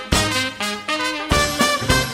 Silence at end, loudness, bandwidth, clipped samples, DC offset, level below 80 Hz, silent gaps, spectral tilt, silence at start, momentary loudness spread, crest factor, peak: 0 s; -19 LUFS; 16 kHz; under 0.1%; under 0.1%; -32 dBFS; none; -3 dB/octave; 0 s; 6 LU; 20 dB; 0 dBFS